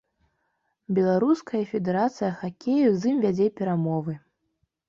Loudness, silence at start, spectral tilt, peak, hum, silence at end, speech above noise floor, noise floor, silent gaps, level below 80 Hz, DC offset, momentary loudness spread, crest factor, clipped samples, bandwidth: -25 LUFS; 0.9 s; -8 dB/octave; -10 dBFS; none; 0.7 s; 51 dB; -75 dBFS; none; -66 dBFS; under 0.1%; 8 LU; 14 dB; under 0.1%; 7.4 kHz